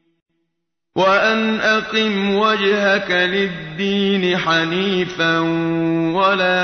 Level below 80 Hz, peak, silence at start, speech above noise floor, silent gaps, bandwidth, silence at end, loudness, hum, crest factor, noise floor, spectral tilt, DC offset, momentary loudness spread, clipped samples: -54 dBFS; -4 dBFS; 0.95 s; 60 dB; none; 6.6 kHz; 0 s; -17 LUFS; none; 14 dB; -77 dBFS; -5.5 dB/octave; under 0.1%; 4 LU; under 0.1%